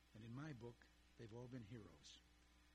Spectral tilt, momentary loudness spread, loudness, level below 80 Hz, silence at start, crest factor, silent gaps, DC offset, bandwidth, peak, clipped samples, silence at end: -6 dB/octave; 9 LU; -59 LUFS; -76 dBFS; 0 s; 16 dB; none; under 0.1%; 13 kHz; -42 dBFS; under 0.1%; 0 s